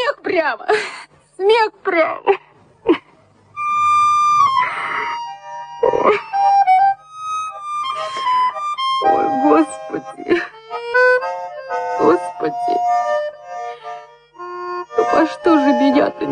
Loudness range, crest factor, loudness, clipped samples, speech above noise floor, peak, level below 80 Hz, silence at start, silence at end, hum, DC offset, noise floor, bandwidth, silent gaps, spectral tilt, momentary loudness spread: 4 LU; 16 dB; -17 LUFS; under 0.1%; 34 dB; -2 dBFS; -60 dBFS; 0 s; 0 s; none; under 0.1%; -51 dBFS; 10 kHz; none; -4 dB/octave; 15 LU